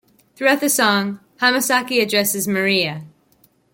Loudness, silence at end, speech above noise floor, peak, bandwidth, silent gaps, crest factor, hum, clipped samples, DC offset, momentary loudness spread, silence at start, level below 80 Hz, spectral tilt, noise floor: -17 LUFS; 0.65 s; 40 dB; -2 dBFS; 17 kHz; none; 16 dB; none; under 0.1%; under 0.1%; 6 LU; 0.4 s; -66 dBFS; -2.5 dB/octave; -58 dBFS